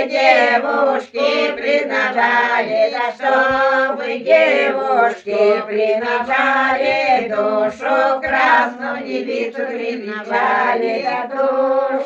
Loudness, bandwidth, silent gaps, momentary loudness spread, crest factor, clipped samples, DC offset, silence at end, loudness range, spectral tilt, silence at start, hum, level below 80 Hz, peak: -16 LUFS; 8 kHz; none; 9 LU; 16 dB; under 0.1%; under 0.1%; 0 s; 3 LU; -4 dB/octave; 0 s; none; -58 dBFS; -2 dBFS